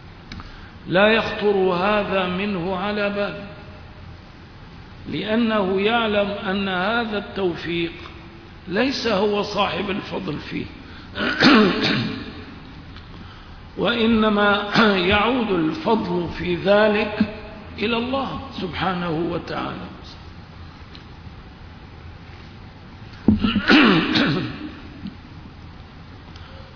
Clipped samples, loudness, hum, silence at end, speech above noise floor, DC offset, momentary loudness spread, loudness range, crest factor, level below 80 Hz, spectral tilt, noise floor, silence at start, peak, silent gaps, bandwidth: under 0.1%; -20 LUFS; none; 0 s; 21 dB; under 0.1%; 24 LU; 9 LU; 22 dB; -44 dBFS; -6 dB/octave; -41 dBFS; 0 s; -2 dBFS; none; 5.4 kHz